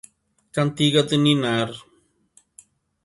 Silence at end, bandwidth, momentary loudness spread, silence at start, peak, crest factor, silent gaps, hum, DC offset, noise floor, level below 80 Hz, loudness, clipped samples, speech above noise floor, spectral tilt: 1.25 s; 11.5 kHz; 12 LU; 0.55 s; -4 dBFS; 18 dB; none; none; under 0.1%; -60 dBFS; -62 dBFS; -21 LUFS; under 0.1%; 40 dB; -5.5 dB/octave